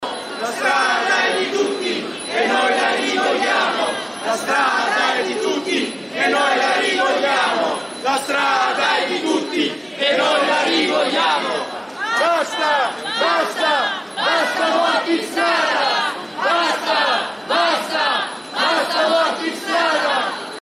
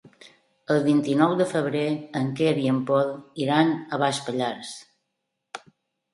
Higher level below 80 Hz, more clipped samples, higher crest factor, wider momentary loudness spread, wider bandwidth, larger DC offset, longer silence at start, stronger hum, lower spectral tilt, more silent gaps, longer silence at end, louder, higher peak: second, -76 dBFS vs -70 dBFS; neither; second, 14 dB vs 20 dB; second, 6 LU vs 18 LU; first, 15.5 kHz vs 11.5 kHz; neither; second, 0 s vs 0.25 s; neither; second, -2 dB/octave vs -6 dB/octave; neither; second, 0 s vs 0.55 s; first, -18 LUFS vs -24 LUFS; about the same, -4 dBFS vs -4 dBFS